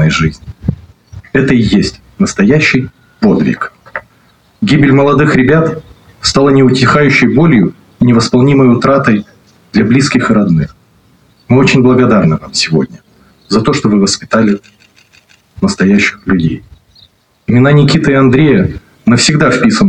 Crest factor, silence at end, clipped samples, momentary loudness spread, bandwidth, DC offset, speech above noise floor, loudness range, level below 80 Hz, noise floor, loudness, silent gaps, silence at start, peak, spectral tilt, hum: 10 dB; 0 s; under 0.1%; 11 LU; 10.5 kHz; under 0.1%; 40 dB; 4 LU; -36 dBFS; -48 dBFS; -9 LUFS; none; 0 s; 0 dBFS; -6 dB/octave; none